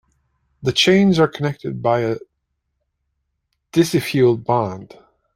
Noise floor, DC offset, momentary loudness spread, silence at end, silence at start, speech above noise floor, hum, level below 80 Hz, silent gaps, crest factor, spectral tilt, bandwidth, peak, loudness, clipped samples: -74 dBFS; under 0.1%; 12 LU; 0.5 s; 0.6 s; 56 dB; none; -54 dBFS; none; 18 dB; -5.5 dB/octave; 15.5 kHz; -2 dBFS; -18 LUFS; under 0.1%